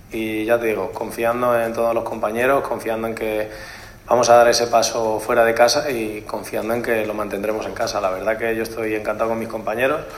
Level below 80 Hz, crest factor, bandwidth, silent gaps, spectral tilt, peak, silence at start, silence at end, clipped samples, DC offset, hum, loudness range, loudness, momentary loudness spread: -48 dBFS; 20 dB; 16 kHz; none; -3.5 dB/octave; 0 dBFS; 0.1 s; 0 s; under 0.1%; under 0.1%; none; 5 LU; -20 LUFS; 11 LU